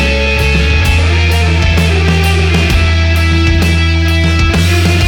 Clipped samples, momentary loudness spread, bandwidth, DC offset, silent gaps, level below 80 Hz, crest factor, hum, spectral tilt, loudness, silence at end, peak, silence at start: under 0.1%; 1 LU; 16 kHz; under 0.1%; none; -14 dBFS; 10 dB; none; -5.5 dB/octave; -10 LUFS; 0 s; 0 dBFS; 0 s